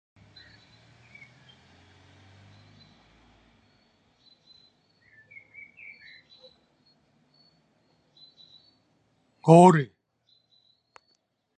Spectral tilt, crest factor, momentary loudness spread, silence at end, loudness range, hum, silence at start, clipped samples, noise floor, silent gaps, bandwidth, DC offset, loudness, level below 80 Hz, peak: -7.5 dB/octave; 26 dB; 32 LU; 1.7 s; 0 LU; none; 9.45 s; under 0.1%; -73 dBFS; none; 9.2 kHz; under 0.1%; -19 LUFS; -72 dBFS; -4 dBFS